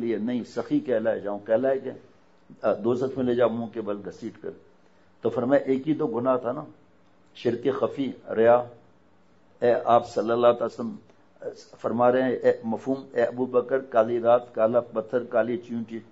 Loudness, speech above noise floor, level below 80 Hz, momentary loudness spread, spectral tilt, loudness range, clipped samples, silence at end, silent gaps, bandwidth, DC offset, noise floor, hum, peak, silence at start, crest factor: -25 LUFS; 36 dB; -70 dBFS; 14 LU; -7.5 dB/octave; 4 LU; under 0.1%; 0.1 s; none; 8 kHz; 0.1%; -61 dBFS; none; -6 dBFS; 0 s; 20 dB